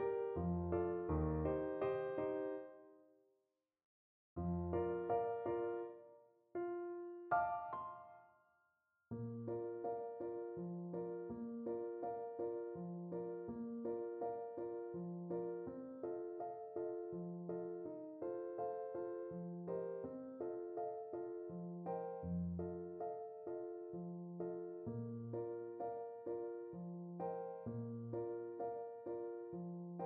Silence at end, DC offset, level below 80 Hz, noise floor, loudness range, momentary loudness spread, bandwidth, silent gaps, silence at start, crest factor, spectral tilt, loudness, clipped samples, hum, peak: 0 s; under 0.1%; -64 dBFS; -87 dBFS; 4 LU; 9 LU; 3.4 kHz; 3.85-4.36 s; 0 s; 20 dB; -9.5 dB/octave; -45 LUFS; under 0.1%; none; -26 dBFS